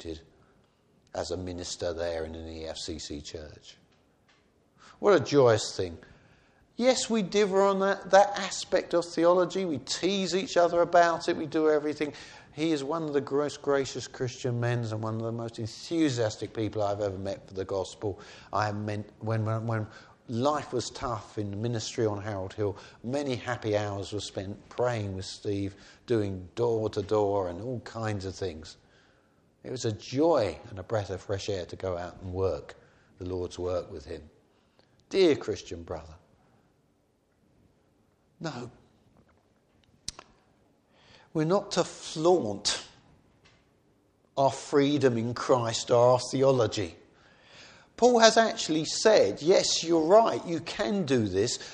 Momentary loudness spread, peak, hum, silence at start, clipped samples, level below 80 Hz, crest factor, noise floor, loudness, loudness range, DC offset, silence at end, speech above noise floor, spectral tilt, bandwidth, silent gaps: 16 LU; -2 dBFS; none; 0 s; under 0.1%; -60 dBFS; 26 dB; -69 dBFS; -28 LUFS; 11 LU; under 0.1%; 0 s; 42 dB; -4.5 dB/octave; 10.5 kHz; none